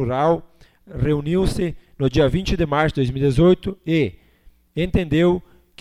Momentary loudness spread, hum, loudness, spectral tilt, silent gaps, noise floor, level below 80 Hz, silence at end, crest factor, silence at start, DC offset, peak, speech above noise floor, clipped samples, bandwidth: 9 LU; none; -20 LUFS; -7.5 dB/octave; none; -52 dBFS; -34 dBFS; 0.4 s; 16 dB; 0 s; under 0.1%; -4 dBFS; 33 dB; under 0.1%; 13 kHz